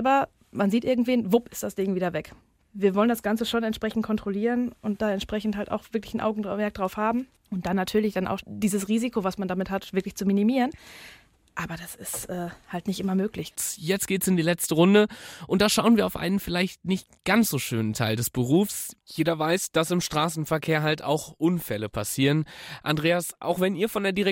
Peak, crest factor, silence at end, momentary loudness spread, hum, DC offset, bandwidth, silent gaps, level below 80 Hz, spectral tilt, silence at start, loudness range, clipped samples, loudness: -6 dBFS; 18 dB; 0 s; 11 LU; none; under 0.1%; 17 kHz; none; -54 dBFS; -5 dB/octave; 0 s; 6 LU; under 0.1%; -26 LUFS